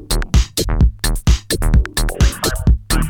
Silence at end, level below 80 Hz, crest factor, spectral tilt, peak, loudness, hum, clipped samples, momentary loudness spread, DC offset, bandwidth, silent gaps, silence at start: 0 s; -16 dBFS; 14 dB; -4.5 dB/octave; 0 dBFS; -17 LUFS; none; under 0.1%; 2 LU; under 0.1%; 18.5 kHz; none; 0 s